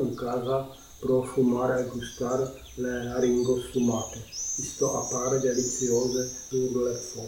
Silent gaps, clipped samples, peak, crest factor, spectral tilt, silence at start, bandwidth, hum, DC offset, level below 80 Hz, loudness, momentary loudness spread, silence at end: none; under 0.1%; -14 dBFS; 14 dB; -4.5 dB/octave; 0 s; 17 kHz; none; under 0.1%; -52 dBFS; -28 LUFS; 8 LU; 0 s